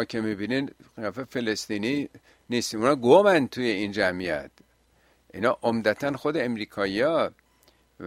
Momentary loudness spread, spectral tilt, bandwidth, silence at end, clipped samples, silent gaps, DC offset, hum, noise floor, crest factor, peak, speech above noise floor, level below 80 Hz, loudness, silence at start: 13 LU; -5 dB/octave; 16 kHz; 0 s; under 0.1%; none; under 0.1%; none; -63 dBFS; 22 dB; -4 dBFS; 38 dB; -62 dBFS; -25 LUFS; 0 s